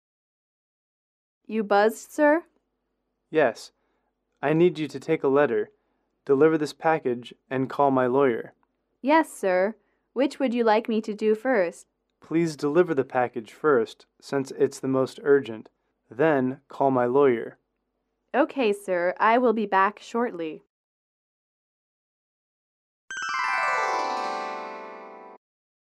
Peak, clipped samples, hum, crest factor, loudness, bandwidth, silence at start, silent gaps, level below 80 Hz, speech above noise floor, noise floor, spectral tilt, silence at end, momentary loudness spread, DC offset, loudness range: -8 dBFS; under 0.1%; none; 18 dB; -24 LUFS; 13.5 kHz; 1.5 s; 20.70-23.08 s; -76 dBFS; 54 dB; -78 dBFS; -6 dB/octave; 0.65 s; 12 LU; under 0.1%; 5 LU